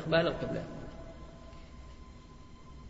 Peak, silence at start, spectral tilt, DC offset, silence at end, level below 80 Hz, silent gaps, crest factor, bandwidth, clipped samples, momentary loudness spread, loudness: -16 dBFS; 0 s; -4 dB/octave; under 0.1%; 0 s; -52 dBFS; none; 22 dB; 7.6 kHz; under 0.1%; 23 LU; -34 LUFS